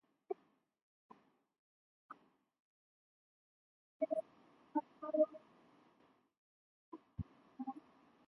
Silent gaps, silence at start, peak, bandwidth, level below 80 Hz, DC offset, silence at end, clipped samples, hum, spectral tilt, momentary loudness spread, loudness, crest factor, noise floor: 0.82-1.09 s, 1.59-2.09 s, 2.60-4.00 s, 6.38-6.92 s; 0.3 s; -22 dBFS; 4.4 kHz; -70 dBFS; under 0.1%; 0.5 s; under 0.1%; none; -8.5 dB/octave; 23 LU; -43 LUFS; 26 dB; -76 dBFS